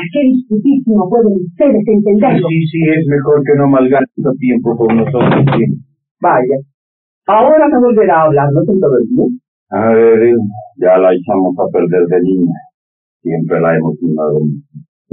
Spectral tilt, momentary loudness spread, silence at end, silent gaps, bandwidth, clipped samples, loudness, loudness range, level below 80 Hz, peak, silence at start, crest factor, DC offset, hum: -8 dB/octave; 8 LU; 0.35 s; 6.11-6.15 s, 6.74-7.22 s, 9.48-9.66 s, 12.74-13.20 s; 4.1 kHz; under 0.1%; -11 LUFS; 3 LU; -52 dBFS; 0 dBFS; 0 s; 10 dB; under 0.1%; none